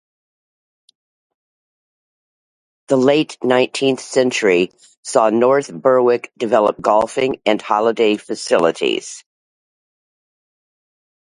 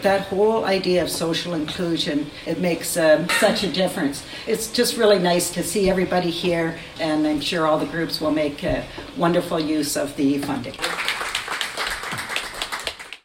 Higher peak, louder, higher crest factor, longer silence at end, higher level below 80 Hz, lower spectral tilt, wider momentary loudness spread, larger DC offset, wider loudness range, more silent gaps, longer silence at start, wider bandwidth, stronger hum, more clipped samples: first, 0 dBFS vs -4 dBFS; first, -16 LUFS vs -22 LUFS; about the same, 18 dB vs 18 dB; first, 2.15 s vs 0.1 s; second, -64 dBFS vs -48 dBFS; about the same, -4.5 dB/octave vs -4 dB/octave; second, 6 LU vs 9 LU; neither; about the same, 6 LU vs 4 LU; first, 4.97-5.03 s vs none; first, 2.9 s vs 0 s; second, 11.5 kHz vs 16.5 kHz; neither; neither